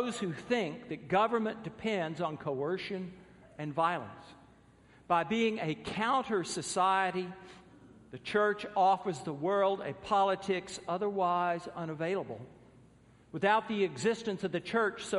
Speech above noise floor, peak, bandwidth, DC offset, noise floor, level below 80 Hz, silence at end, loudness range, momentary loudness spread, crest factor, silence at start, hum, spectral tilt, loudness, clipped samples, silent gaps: 28 dB; -14 dBFS; 11.5 kHz; under 0.1%; -61 dBFS; -68 dBFS; 0 s; 4 LU; 12 LU; 20 dB; 0 s; none; -5 dB/octave; -32 LUFS; under 0.1%; none